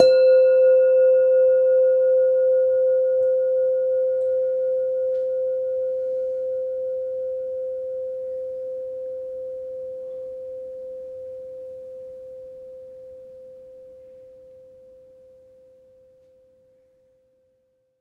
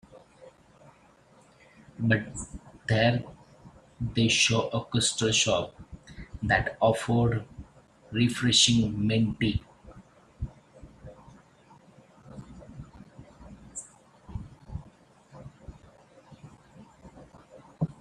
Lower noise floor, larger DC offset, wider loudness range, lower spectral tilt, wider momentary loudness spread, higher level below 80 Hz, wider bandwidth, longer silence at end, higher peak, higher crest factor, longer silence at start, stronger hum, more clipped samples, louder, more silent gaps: first, -68 dBFS vs -59 dBFS; neither; about the same, 22 LU vs 22 LU; about the same, -4.5 dB/octave vs -4 dB/octave; second, 23 LU vs 26 LU; second, -68 dBFS vs -50 dBFS; second, 4.3 kHz vs 12 kHz; first, 3.75 s vs 0.1 s; first, 0 dBFS vs -6 dBFS; about the same, 22 dB vs 24 dB; second, 0 s vs 0.15 s; neither; neither; first, -21 LUFS vs -26 LUFS; neither